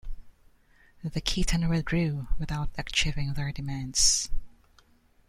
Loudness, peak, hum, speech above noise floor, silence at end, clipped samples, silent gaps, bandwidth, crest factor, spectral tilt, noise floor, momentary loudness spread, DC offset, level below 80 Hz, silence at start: -28 LUFS; -8 dBFS; none; 34 dB; 0.8 s; under 0.1%; none; 14.5 kHz; 20 dB; -3 dB/octave; -61 dBFS; 14 LU; under 0.1%; -36 dBFS; 0.05 s